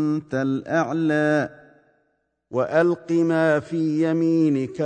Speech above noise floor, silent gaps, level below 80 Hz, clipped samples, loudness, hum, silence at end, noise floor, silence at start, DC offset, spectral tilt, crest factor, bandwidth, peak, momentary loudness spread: 50 dB; none; -66 dBFS; under 0.1%; -22 LUFS; none; 0 s; -71 dBFS; 0 s; under 0.1%; -7.5 dB/octave; 16 dB; 9 kHz; -6 dBFS; 5 LU